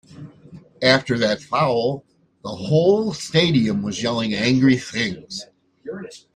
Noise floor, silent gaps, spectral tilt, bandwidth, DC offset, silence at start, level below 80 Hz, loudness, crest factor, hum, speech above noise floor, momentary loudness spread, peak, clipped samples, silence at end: -45 dBFS; none; -5.5 dB/octave; 10.5 kHz; under 0.1%; 0.1 s; -56 dBFS; -19 LUFS; 18 dB; none; 25 dB; 17 LU; -4 dBFS; under 0.1%; 0.15 s